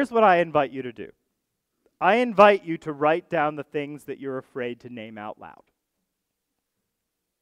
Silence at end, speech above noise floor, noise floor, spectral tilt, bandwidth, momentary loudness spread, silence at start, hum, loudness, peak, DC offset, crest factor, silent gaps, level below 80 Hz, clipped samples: 1.9 s; 58 dB; -81 dBFS; -6.5 dB/octave; 11.5 kHz; 21 LU; 0 s; none; -22 LUFS; -2 dBFS; under 0.1%; 24 dB; none; -68 dBFS; under 0.1%